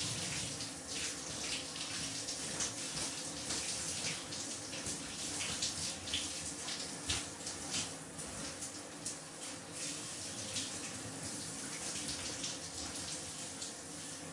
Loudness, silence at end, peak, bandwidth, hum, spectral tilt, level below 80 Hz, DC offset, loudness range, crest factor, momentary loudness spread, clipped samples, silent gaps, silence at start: -39 LUFS; 0 s; -22 dBFS; 12 kHz; none; -1.5 dB/octave; -66 dBFS; under 0.1%; 3 LU; 20 dB; 6 LU; under 0.1%; none; 0 s